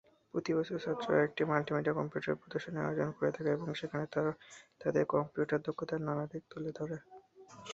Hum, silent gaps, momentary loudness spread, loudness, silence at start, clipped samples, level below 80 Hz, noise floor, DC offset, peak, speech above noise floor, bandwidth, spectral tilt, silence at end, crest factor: none; none; 11 LU; -35 LUFS; 0.35 s; under 0.1%; -72 dBFS; -55 dBFS; under 0.1%; -14 dBFS; 20 dB; 7.8 kHz; -7 dB/octave; 0 s; 22 dB